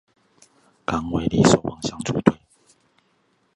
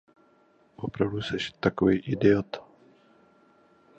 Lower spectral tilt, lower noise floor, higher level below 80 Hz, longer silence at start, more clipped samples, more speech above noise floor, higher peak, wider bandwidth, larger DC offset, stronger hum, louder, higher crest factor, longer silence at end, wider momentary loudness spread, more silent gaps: second, -5.5 dB/octave vs -7 dB/octave; about the same, -65 dBFS vs -62 dBFS; first, -46 dBFS vs -56 dBFS; about the same, 0.9 s vs 0.8 s; neither; first, 46 dB vs 37 dB; first, 0 dBFS vs -8 dBFS; first, 11.5 kHz vs 8.2 kHz; neither; neither; first, -21 LUFS vs -27 LUFS; about the same, 24 dB vs 22 dB; second, 1.2 s vs 1.4 s; about the same, 13 LU vs 15 LU; neither